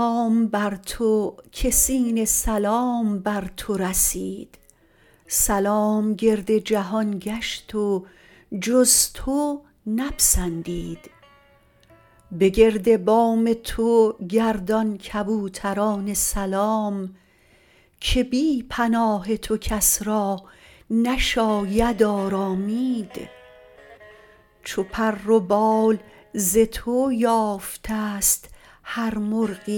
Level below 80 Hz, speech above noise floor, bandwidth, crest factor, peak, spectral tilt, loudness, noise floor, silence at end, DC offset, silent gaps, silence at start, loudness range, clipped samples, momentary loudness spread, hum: -38 dBFS; 35 dB; 19 kHz; 20 dB; -4 dBFS; -3.5 dB/octave; -22 LUFS; -57 dBFS; 0 s; under 0.1%; none; 0 s; 4 LU; under 0.1%; 11 LU; none